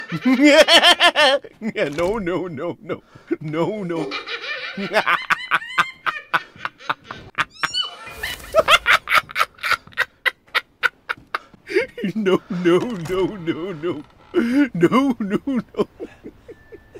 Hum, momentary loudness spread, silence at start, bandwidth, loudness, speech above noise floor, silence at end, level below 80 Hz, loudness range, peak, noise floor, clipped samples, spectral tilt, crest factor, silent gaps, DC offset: none; 15 LU; 0 s; 16 kHz; -19 LUFS; 24 dB; 0 s; -52 dBFS; 6 LU; 0 dBFS; -43 dBFS; under 0.1%; -4 dB/octave; 20 dB; none; under 0.1%